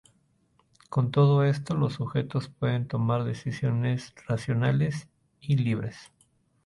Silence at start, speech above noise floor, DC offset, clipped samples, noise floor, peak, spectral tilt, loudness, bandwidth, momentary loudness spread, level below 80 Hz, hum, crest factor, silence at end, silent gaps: 0.9 s; 41 dB; under 0.1%; under 0.1%; -67 dBFS; -10 dBFS; -8 dB/octave; -27 LUFS; 11.5 kHz; 10 LU; -58 dBFS; none; 16 dB; 0.6 s; none